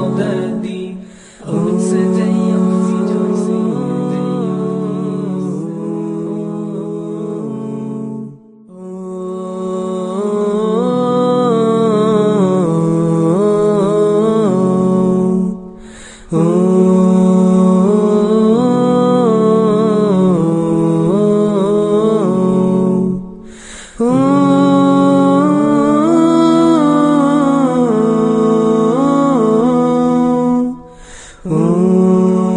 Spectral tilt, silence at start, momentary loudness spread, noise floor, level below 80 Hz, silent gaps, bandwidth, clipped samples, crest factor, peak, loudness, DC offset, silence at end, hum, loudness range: -8 dB/octave; 0 s; 12 LU; -37 dBFS; -48 dBFS; none; 10 kHz; under 0.1%; 12 dB; 0 dBFS; -13 LUFS; under 0.1%; 0 s; none; 10 LU